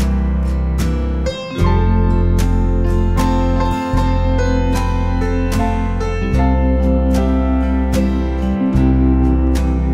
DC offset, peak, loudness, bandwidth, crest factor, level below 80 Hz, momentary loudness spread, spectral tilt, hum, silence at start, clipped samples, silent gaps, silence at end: under 0.1%; -2 dBFS; -17 LUFS; 13 kHz; 12 dB; -18 dBFS; 4 LU; -7.5 dB/octave; none; 0 s; under 0.1%; none; 0 s